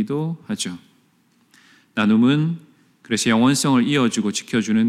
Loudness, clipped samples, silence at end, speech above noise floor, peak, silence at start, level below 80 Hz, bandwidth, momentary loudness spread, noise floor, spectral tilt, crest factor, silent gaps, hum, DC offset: -20 LUFS; under 0.1%; 0 s; 41 dB; -6 dBFS; 0 s; -66 dBFS; 14.5 kHz; 12 LU; -60 dBFS; -5 dB/octave; 14 dB; none; none; under 0.1%